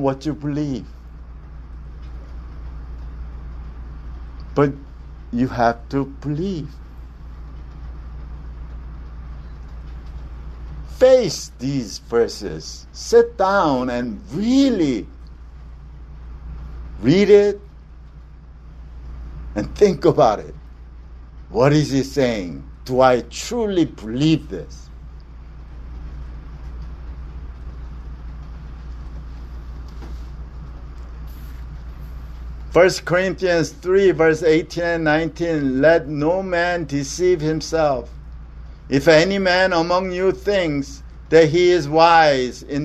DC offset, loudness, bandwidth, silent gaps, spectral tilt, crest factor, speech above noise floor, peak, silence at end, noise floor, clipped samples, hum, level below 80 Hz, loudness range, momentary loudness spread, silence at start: under 0.1%; -18 LUFS; 13.5 kHz; none; -5.5 dB/octave; 20 dB; 23 dB; 0 dBFS; 0 s; -40 dBFS; under 0.1%; none; -36 dBFS; 18 LU; 23 LU; 0 s